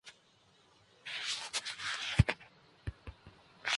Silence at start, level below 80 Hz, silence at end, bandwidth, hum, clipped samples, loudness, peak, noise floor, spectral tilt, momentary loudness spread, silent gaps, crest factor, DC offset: 0.05 s; -46 dBFS; 0 s; 11.5 kHz; none; under 0.1%; -36 LUFS; -10 dBFS; -67 dBFS; -3.5 dB/octave; 21 LU; none; 28 dB; under 0.1%